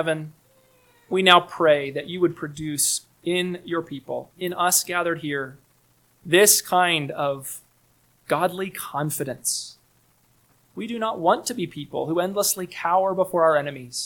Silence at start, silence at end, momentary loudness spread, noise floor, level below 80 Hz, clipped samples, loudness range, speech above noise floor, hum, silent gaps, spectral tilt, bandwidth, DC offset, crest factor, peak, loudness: 0 s; 0 s; 16 LU; -62 dBFS; -66 dBFS; under 0.1%; 7 LU; 39 dB; none; none; -2.5 dB/octave; 19 kHz; under 0.1%; 24 dB; 0 dBFS; -22 LUFS